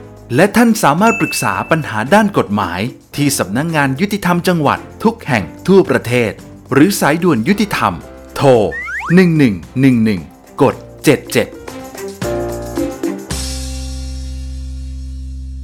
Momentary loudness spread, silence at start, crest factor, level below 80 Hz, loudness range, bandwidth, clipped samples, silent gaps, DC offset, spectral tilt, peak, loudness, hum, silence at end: 16 LU; 0 s; 14 dB; -32 dBFS; 9 LU; over 20 kHz; under 0.1%; none; under 0.1%; -5.5 dB/octave; 0 dBFS; -14 LUFS; none; 0 s